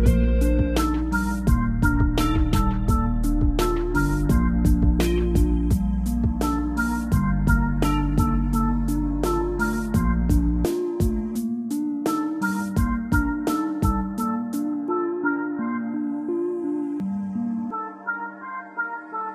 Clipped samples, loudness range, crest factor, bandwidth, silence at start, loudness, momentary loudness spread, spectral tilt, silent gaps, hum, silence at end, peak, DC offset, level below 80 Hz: under 0.1%; 4 LU; 16 dB; 15.5 kHz; 0 s; -24 LUFS; 6 LU; -7 dB/octave; none; none; 0 s; -6 dBFS; under 0.1%; -26 dBFS